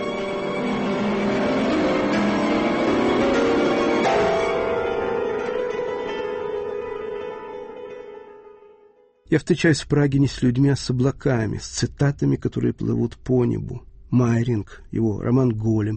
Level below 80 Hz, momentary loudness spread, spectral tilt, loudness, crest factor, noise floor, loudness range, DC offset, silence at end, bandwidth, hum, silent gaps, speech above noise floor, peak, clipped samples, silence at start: -44 dBFS; 11 LU; -6.5 dB/octave; -22 LUFS; 18 dB; -55 dBFS; 8 LU; under 0.1%; 0 s; 8.8 kHz; none; none; 34 dB; -4 dBFS; under 0.1%; 0 s